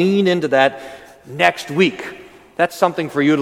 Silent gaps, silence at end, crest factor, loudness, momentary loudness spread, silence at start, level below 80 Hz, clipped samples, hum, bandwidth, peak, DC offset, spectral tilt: none; 0 s; 18 dB; -17 LUFS; 19 LU; 0 s; -60 dBFS; under 0.1%; none; 16.5 kHz; 0 dBFS; under 0.1%; -5.5 dB/octave